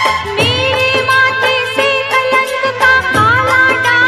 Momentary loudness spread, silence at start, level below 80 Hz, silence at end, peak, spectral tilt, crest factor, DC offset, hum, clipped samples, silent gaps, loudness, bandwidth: 3 LU; 0 s; -38 dBFS; 0 s; 0 dBFS; -3.5 dB/octave; 12 dB; 0.2%; none; under 0.1%; none; -10 LUFS; 14.5 kHz